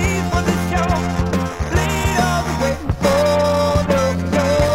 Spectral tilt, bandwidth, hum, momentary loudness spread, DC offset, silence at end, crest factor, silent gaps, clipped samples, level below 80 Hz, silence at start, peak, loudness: -5.5 dB/octave; 16 kHz; none; 5 LU; under 0.1%; 0 s; 14 dB; none; under 0.1%; -30 dBFS; 0 s; -2 dBFS; -18 LUFS